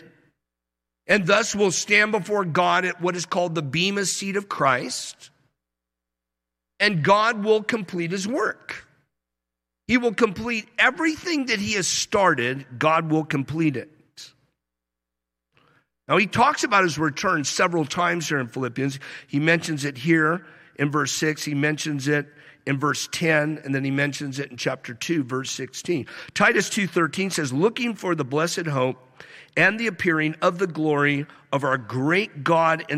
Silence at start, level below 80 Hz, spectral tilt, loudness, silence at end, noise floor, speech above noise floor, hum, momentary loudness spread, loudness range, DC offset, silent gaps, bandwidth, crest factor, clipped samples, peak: 1.1 s; -62 dBFS; -4 dB/octave; -22 LUFS; 0 s; -85 dBFS; 62 dB; none; 9 LU; 4 LU; under 0.1%; none; 15.5 kHz; 20 dB; under 0.1%; -4 dBFS